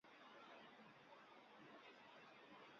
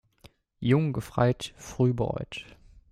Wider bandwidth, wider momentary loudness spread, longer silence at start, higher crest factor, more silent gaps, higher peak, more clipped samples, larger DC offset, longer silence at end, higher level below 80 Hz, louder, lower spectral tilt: second, 7 kHz vs 14 kHz; second, 3 LU vs 13 LU; second, 0.05 s vs 0.6 s; second, 12 dB vs 20 dB; neither; second, -52 dBFS vs -10 dBFS; neither; neither; second, 0 s vs 0.5 s; second, under -90 dBFS vs -52 dBFS; second, -64 LUFS vs -28 LUFS; second, -1.5 dB/octave vs -7 dB/octave